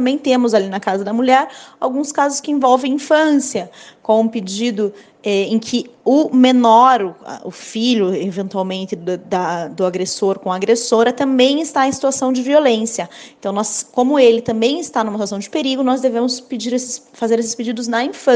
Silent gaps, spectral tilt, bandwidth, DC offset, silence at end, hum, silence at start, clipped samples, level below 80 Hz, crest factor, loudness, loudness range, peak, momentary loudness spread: none; -4 dB/octave; 10 kHz; under 0.1%; 0 s; none; 0 s; under 0.1%; -62 dBFS; 16 dB; -16 LUFS; 4 LU; 0 dBFS; 11 LU